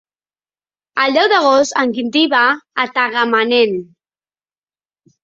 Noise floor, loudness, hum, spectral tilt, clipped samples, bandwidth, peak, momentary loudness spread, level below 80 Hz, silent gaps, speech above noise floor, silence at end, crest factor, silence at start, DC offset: under -90 dBFS; -14 LUFS; none; -3 dB/octave; under 0.1%; 7.8 kHz; 0 dBFS; 7 LU; -64 dBFS; none; over 76 dB; 1.4 s; 16 dB; 0.95 s; under 0.1%